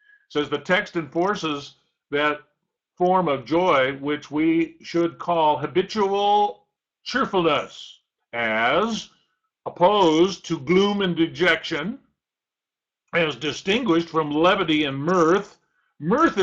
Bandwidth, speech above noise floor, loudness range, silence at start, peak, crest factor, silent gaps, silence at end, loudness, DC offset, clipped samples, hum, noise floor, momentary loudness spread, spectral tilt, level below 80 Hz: 7.8 kHz; 68 dB; 3 LU; 0.3 s; -6 dBFS; 16 dB; none; 0 s; -22 LUFS; under 0.1%; under 0.1%; none; -89 dBFS; 13 LU; -5.5 dB/octave; -58 dBFS